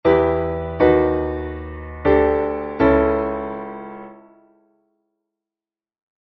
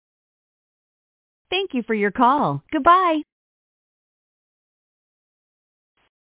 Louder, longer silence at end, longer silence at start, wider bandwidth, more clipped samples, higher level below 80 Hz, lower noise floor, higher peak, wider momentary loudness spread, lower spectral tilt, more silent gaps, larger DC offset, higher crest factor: about the same, -19 LUFS vs -19 LUFS; second, 2.1 s vs 3.15 s; second, 0.05 s vs 1.5 s; first, 5.8 kHz vs 4 kHz; neither; first, -38 dBFS vs -60 dBFS; about the same, under -90 dBFS vs under -90 dBFS; about the same, -2 dBFS vs -4 dBFS; first, 17 LU vs 9 LU; second, -6.5 dB/octave vs -9 dB/octave; neither; neither; about the same, 18 dB vs 22 dB